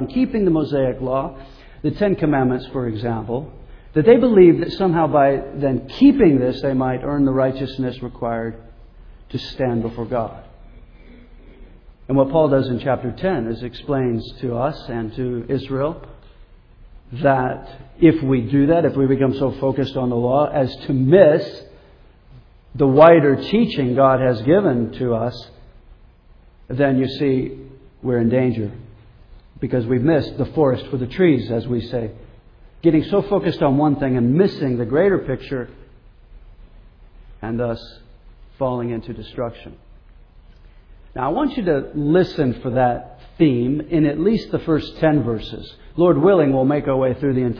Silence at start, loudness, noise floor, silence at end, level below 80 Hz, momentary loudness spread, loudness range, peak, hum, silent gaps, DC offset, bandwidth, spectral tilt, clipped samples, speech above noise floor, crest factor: 0 s; -18 LUFS; -48 dBFS; 0 s; -42 dBFS; 14 LU; 11 LU; 0 dBFS; none; none; under 0.1%; 5.4 kHz; -10 dB/octave; under 0.1%; 31 dB; 18 dB